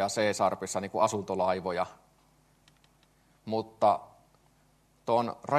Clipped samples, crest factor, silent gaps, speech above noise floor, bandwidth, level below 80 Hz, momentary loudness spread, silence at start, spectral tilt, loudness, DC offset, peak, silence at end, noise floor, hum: under 0.1%; 20 dB; none; 37 dB; 13 kHz; -72 dBFS; 8 LU; 0 s; -4.5 dB/octave; -30 LUFS; under 0.1%; -10 dBFS; 0 s; -66 dBFS; none